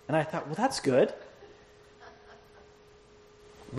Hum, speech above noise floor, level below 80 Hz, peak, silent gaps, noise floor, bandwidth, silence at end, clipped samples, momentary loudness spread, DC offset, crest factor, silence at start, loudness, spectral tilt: none; 29 dB; -66 dBFS; -12 dBFS; none; -56 dBFS; 13 kHz; 0 s; under 0.1%; 27 LU; under 0.1%; 20 dB; 0.1 s; -28 LUFS; -5.5 dB/octave